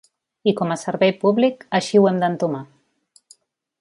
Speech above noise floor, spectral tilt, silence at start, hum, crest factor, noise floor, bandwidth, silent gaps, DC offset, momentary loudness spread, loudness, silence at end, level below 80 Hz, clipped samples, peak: 41 dB; -6 dB/octave; 0.45 s; none; 18 dB; -59 dBFS; 11.5 kHz; none; under 0.1%; 8 LU; -19 LUFS; 1.15 s; -68 dBFS; under 0.1%; -4 dBFS